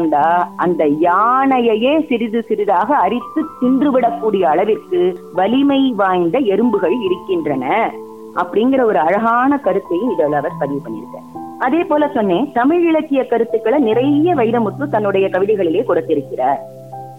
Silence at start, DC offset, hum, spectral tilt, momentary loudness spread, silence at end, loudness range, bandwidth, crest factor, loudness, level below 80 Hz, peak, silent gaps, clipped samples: 0 s; 0.3%; none; -8 dB/octave; 7 LU; 0 s; 2 LU; 6 kHz; 12 dB; -15 LUFS; -60 dBFS; -4 dBFS; none; under 0.1%